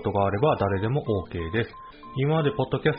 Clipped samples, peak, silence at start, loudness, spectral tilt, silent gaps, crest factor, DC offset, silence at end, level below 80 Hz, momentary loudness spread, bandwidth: under 0.1%; -10 dBFS; 0 s; -26 LUFS; -6 dB/octave; none; 16 dB; under 0.1%; 0 s; -48 dBFS; 9 LU; 5.2 kHz